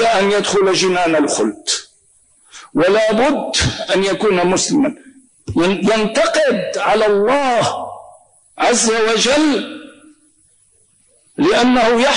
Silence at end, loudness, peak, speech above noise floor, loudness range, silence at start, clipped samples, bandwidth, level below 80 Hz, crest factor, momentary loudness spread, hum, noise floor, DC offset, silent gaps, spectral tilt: 0 s; -15 LUFS; -6 dBFS; 41 dB; 2 LU; 0 s; under 0.1%; 10.5 kHz; -44 dBFS; 10 dB; 8 LU; none; -55 dBFS; under 0.1%; none; -3.5 dB/octave